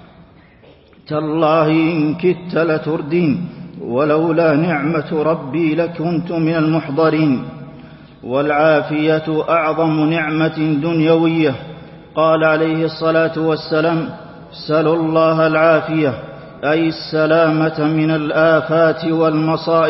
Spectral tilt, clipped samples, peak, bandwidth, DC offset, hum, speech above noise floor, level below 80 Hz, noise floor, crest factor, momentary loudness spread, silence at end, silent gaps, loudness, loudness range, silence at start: -11.5 dB/octave; under 0.1%; -2 dBFS; 5.8 kHz; under 0.1%; none; 30 dB; -54 dBFS; -46 dBFS; 14 dB; 9 LU; 0 s; none; -16 LUFS; 2 LU; 1.1 s